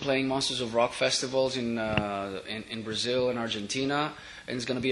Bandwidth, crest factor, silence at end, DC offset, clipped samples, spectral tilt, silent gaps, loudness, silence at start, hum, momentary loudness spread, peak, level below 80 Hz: 11.5 kHz; 22 dB; 0 s; under 0.1%; under 0.1%; -3.5 dB/octave; none; -29 LUFS; 0 s; none; 9 LU; -6 dBFS; -58 dBFS